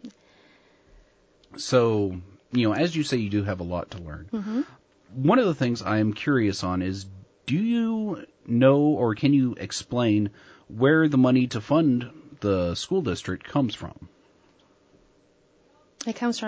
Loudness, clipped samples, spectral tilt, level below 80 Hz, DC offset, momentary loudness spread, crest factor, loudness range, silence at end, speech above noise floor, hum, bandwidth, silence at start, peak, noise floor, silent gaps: -24 LUFS; under 0.1%; -6.5 dB/octave; -50 dBFS; under 0.1%; 16 LU; 18 dB; 7 LU; 0 s; 38 dB; none; 8 kHz; 0.05 s; -6 dBFS; -61 dBFS; none